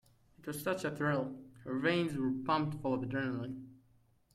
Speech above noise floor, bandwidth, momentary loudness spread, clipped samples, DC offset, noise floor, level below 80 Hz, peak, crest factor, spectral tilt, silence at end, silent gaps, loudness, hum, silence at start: 34 dB; 16 kHz; 12 LU; under 0.1%; under 0.1%; -69 dBFS; -68 dBFS; -20 dBFS; 18 dB; -6 dB/octave; 0.6 s; none; -36 LUFS; none; 0.4 s